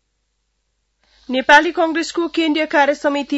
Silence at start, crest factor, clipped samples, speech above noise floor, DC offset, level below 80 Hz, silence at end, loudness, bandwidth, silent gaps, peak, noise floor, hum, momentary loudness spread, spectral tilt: 1.3 s; 18 dB; under 0.1%; 53 dB; under 0.1%; -56 dBFS; 0 s; -16 LUFS; 8.8 kHz; none; 0 dBFS; -69 dBFS; none; 9 LU; -2 dB/octave